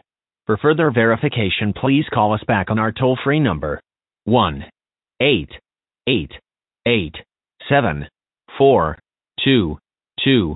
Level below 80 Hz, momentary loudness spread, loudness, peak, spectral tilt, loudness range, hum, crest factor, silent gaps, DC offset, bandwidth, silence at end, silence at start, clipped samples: -42 dBFS; 18 LU; -18 LUFS; 0 dBFS; -11.5 dB/octave; 4 LU; none; 18 dB; none; under 0.1%; 4.1 kHz; 0 s; 0.5 s; under 0.1%